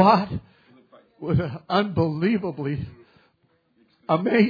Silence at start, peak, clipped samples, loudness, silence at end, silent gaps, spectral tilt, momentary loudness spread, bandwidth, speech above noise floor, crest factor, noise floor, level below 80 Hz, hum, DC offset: 0 s; -4 dBFS; under 0.1%; -24 LUFS; 0 s; none; -9 dB/octave; 15 LU; 5 kHz; 44 dB; 20 dB; -66 dBFS; -52 dBFS; none; under 0.1%